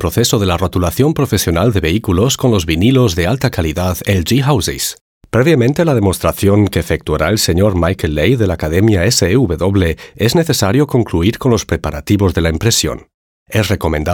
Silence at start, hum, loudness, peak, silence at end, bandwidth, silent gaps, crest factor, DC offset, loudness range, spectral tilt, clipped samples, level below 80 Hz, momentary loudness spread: 0 s; none; -14 LUFS; 0 dBFS; 0 s; 18 kHz; 5.01-5.21 s, 13.14-13.46 s; 12 dB; under 0.1%; 1 LU; -5 dB/octave; under 0.1%; -30 dBFS; 6 LU